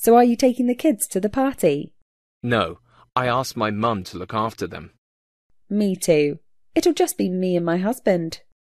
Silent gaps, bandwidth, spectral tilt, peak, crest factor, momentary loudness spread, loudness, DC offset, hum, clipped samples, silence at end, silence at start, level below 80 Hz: 2.02-2.41 s, 4.98-5.49 s; 14 kHz; -5.5 dB/octave; -4 dBFS; 18 dB; 12 LU; -21 LUFS; under 0.1%; none; under 0.1%; 0.4 s; 0 s; -54 dBFS